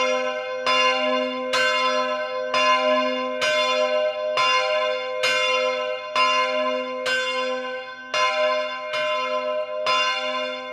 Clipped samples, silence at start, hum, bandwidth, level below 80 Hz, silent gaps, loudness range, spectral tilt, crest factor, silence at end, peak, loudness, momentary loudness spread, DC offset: under 0.1%; 0 s; none; 13 kHz; -76 dBFS; none; 3 LU; -0.5 dB/octave; 14 dB; 0 s; -8 dBFS; -22 LUFS; 7 LU; under 0.1%